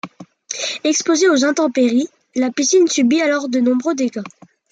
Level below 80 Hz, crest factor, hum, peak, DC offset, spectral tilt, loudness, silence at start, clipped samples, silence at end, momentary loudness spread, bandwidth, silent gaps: -70 dBFS; 14 dB; none; -4 dBFS; under 0.1%; -2.5 dB/octave; -16 LUFS; 0.05 s; under 0.1%; 0.45 s; 11 LU; 9.2 kHz; none